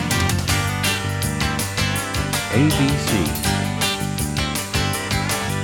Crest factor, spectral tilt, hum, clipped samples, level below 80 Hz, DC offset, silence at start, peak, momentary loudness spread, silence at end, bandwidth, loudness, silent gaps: 16 dB; -4 dB/octave; none; under 0.1%; -34 dBFS; under 0.1%; 0 s; -4 dBFS; 4 LU; 0 s; 19 kHz; -20 LUFS; none